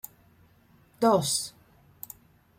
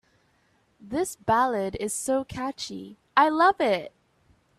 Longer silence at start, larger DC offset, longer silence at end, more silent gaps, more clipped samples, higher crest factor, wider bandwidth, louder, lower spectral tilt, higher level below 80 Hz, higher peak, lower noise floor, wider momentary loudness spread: first, 1 s vs 0.85 s; neither; first, 1.1 s vs 0.7 s; neither; neither; about the same, 20 dB vs 22 dB; about the same, 16.5 kHz vs 15 kHz; about the same, -26 LUFS vs -25 LUFS; about the same, -4 dB/octave vs -3.5 dB/octave; second, -66 dBFS vs -58 dBFS; second, -12 dBFS vs -4 dBFS; second, -60 dBFS vs -66 dBFS; first, 22 LU vs 14 LU